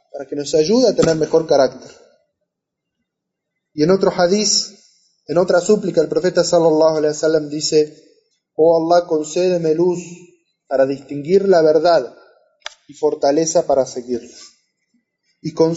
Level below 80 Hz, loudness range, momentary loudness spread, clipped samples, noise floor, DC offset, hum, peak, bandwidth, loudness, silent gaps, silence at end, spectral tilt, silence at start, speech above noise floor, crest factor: -56 dBFS; 4 LU; 14 LU; under 0.1%; -79 dBFS; under 0.1%; none; -2 dBFS; 8 kHz; -16 LUFS; none; 0 s; -4.5 dB/octave; 0.15 s; 64 dB; 14 dB